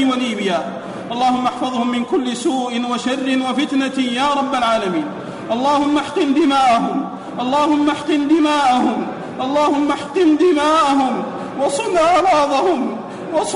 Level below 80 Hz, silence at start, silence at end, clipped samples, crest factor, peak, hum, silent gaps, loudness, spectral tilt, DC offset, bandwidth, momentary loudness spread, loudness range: -54 dBFS; 0 s; 0 s; under 0.1%; 12 dB; -6 dBFS; none; none; -17 LUFS; -4.5 dB/octave; under 0.1%; 11 kHz; 10 LU; 3 LU